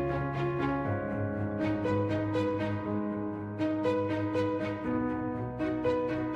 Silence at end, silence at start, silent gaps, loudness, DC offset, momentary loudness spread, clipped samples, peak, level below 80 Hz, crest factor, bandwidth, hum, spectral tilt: 0 s; 0 s; none; -32 LUFS; under 0.1%; 4 LU; under 0.1%; -18 dBFS; -54 dBFS; 14 dB; 8 kHz; none; -8.5 dB/octave